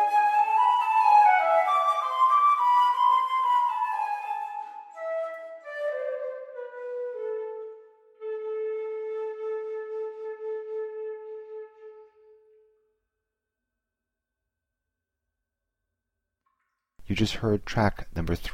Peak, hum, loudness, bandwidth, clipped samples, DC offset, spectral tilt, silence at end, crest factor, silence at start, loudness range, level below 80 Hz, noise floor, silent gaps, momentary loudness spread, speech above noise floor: -8 dBFS; none; -25 LUFS; 15 kHz; under 0.1%; under 0.1%; -5.5 dB/octave; 0 s; 18 dB; 0 s; 18 LU; -50 dBFS; -87 dBFS; none; 18 LU; 60 dB